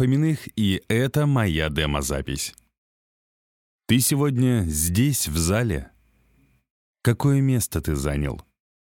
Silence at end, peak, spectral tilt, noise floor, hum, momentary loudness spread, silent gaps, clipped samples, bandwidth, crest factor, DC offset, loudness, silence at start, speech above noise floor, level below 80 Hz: 0.4 s; -6 dBFS; -5 dB/octave; -62 dBFS; none; 8 LU; 2.78-3.79 s, 6.70-6.94 s; under 0.1%; 18 kHz; 18 dB; under 0.1%; -23 LUFS; 0 s; 40 dB; -40 dBFS